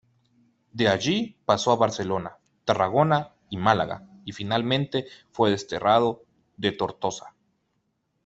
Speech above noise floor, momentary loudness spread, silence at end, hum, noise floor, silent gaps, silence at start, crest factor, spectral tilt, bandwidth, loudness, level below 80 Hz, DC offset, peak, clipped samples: 50 dB; 15 LU; 0.95 s; none; -74 dBFS; none; 0.75 s; 22 dB; -5 dB/octave; 8.2 kHz; -25 LUFS; -60 dBFS; under 0.1%; -4 dBFS; under 0.1%